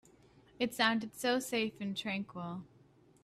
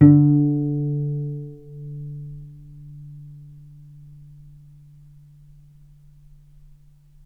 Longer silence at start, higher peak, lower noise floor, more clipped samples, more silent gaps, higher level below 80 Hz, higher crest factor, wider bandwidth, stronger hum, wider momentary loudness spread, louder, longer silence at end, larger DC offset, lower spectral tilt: first, 0.6 s vs 0 s; second, -14 dBFS vs 0 dBFS; first, -64 dBFS vs -50 dBFS; neither; neither; second, -74 dBFS vs -52 dBFS; about the same, 22 dB vs 24 dB; first, 15.5 kHz vs 2 kHz; neither; second, 12 LU vs 28 LU; second, -35 LUFS vs -21 LUFS; second, 0.55 s vs 3.95 s; neither; second, -4 dB/octave vs -13 dB/octave